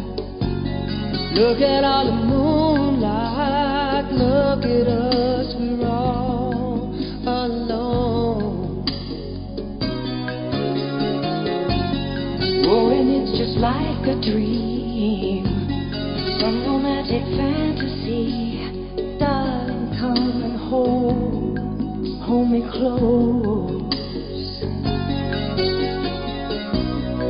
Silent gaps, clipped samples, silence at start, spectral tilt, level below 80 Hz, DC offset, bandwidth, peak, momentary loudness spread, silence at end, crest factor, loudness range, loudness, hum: none; under 0.1%; 0 s; -11.5 dB/octave; -34 dBFS; under 0.1%; 5.4 kHz; -4 dBFS; 8 LU; 0 s; 16 dB; 5 LU; -21 LUFS; none